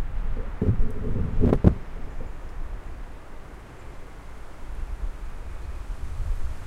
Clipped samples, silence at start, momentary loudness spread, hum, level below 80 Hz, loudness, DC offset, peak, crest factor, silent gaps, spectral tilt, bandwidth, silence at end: under 0.1%; 0 s; 21 LU; none; -30 dBFS; -29 LUFS; under 0.1%; 0 dBFS; 26 dB; none; -9 dB/octave; 7.2 kHz; 0 s